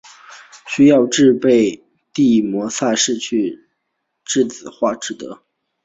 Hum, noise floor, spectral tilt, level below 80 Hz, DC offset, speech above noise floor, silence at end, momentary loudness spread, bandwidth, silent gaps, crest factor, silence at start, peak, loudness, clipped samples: none; -73 dBFS; -4 dB/octave; -58 dBFS; under 0.1%; 58 dB; 0.5 s; 18 LU; 8 kHz; none; 16 dB; 0.3 s; -2 dBFS; -16 LUFS; under 0.1%